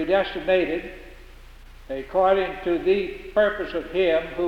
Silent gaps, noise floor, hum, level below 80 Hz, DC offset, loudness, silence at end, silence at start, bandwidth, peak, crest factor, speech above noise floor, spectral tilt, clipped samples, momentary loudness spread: none; -44 dBFS; none; -44 dBFS; under 0.1%; -23 LUFS; 0 s; 0 s; 7.8 kHz; -8 dBFS; 16 dB; 21 dB; -6.5 dB/octave; under 0.1%; 12 LU